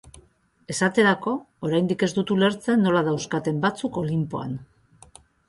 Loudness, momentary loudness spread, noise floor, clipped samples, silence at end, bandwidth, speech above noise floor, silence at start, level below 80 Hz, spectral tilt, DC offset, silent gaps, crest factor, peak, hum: -23 LUFS; 9 LU; -58 dBFS; under 0.1%; 0.85 s; 11.5 kHz; 36 dB; 0.05 s; -60 dBFS; -5.5 dB/octave; under 0.1%; none; 18 dB; -8 dBFS; none